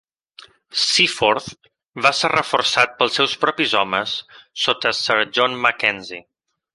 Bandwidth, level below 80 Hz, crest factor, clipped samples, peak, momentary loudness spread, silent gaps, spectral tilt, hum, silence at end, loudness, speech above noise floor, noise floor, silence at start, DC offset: 11.5 kHz; -60 dBFS; 20 dB; under 0.1%; -2 dBFS; 13 LU; 1.88-1.92 s; -2 dB/octave; none; 0.55 s; -18 LUFS; 28 dB; -47 dBFS; 0.75 s; under 0.1%